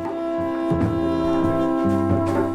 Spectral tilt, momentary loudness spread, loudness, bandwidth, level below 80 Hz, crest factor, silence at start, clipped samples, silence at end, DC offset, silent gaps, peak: -8.5 dB/octave; 4 LU; -21 LUFS; 11 kHz; -42 dBFS; 14 dB; 0 s; under 0.1%; 0 s; under 0.1%; none; -8 dBFS